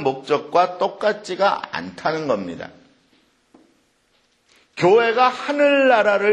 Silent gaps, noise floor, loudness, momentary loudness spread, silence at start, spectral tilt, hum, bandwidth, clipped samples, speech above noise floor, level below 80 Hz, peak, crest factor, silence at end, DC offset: none; -63 dBFS; -19 LUFS; 14 LU; 0 s; -5 dB/octave; none; 10 kHz; under 0.1%; 44 dB; -66 dBFS; -2 dBFS; 18 dB; 0 s; under 0.1%